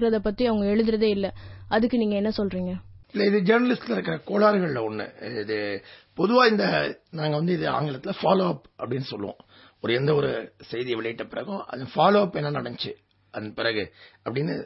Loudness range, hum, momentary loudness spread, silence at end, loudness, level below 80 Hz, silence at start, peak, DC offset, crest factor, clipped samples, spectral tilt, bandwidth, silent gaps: 3 LU; none; 14 LU; 0 s; -25 LUFS; -54 dBFS; 0 s; -6 dBFS; under 0.1%; 20 dB; under 0.1%; -10 dB/octave; 5.8 kHz; none